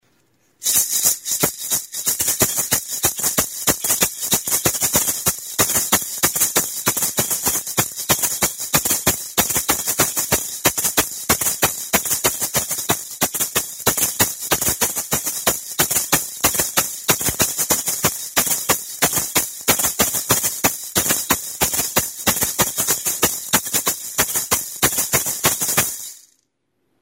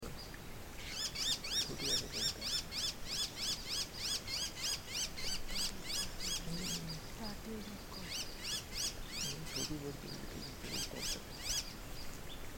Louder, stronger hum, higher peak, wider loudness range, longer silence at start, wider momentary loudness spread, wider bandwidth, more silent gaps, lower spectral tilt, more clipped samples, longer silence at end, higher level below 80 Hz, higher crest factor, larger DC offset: first, -18 LUFS vs -39 LUFS; neither; first, 0 dBFS vs -22 dBFS; second, 1 LU vs 5 LU; first, 0.6 s vs 0 s; second, 4 LU vs 12 LU; about the same, 16.5 kHz vs 17 kHz; neither; about the same, -1 dB/octave vs -1.5 dB/octave; neither; first, 0.85 s vs 0 s; first, -46 dBFS vs -52 dBFS; about the same, 20 dB vs 18 dB; neither